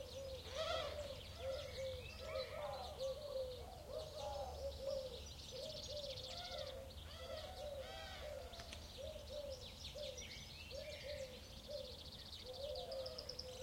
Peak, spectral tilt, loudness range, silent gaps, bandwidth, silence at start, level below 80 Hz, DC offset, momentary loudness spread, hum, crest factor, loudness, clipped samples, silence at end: -30 dBFS; -3.5 dB/octave; 4 LU; none; 16.5 kHz; 0 s; -60 dBFS; under 0.1%; 6 LU; none; 18 dB; -49 LUFS; under 0.1%; 0 s